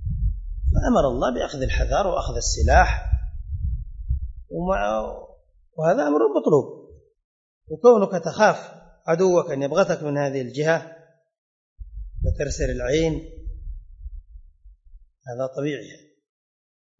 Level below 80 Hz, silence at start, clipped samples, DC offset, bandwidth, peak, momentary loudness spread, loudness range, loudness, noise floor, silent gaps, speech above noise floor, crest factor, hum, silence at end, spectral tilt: -30 dBFS; 0 s; under 0.1%; under 0.1%; 8 kHz; -2 dBFS; 21 LU; 8 LU; -22 LUFS; -54 dBFS; 7.24-7.61 s, 11.38-11.76 s; 33 dB; 22 dB; none; 1.05 s; -5.5 dB/octave